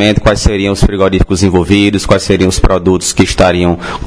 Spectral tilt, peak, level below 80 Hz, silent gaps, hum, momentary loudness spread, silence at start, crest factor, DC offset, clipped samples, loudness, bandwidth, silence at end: -5 dB/octave; 0 dBFS; -18 dBFS; none; none; 3 LU; 0 s; 10 dB; under 0.1%; 1%; -10 LUFS; 11 kHz; 0 s